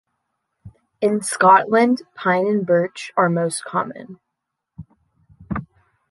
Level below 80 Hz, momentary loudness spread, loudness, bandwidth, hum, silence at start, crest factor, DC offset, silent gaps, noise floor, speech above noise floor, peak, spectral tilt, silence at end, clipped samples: -52 dBFS; 17 LU; -19 LUFS; 12 kHz; none; 0.65 s; 18 dB; under 0.1%; none; -80 dBFS; 62 dB; -2 dBFS; -5 dB/octave; 0.45 s; under 0.1%